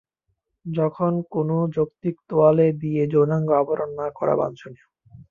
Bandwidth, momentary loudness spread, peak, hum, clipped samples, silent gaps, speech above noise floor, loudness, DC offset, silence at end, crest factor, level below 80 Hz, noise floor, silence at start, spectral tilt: 6.8 kHz; 11 LU; -4 dBFS; none; under 0.1%; none; 54 dB; -22 LUFS; under 0.1%; 0.05 s; 18 dB; -62 dBFS; -75 dBFS; 0.65 s; -10.5 dB/octave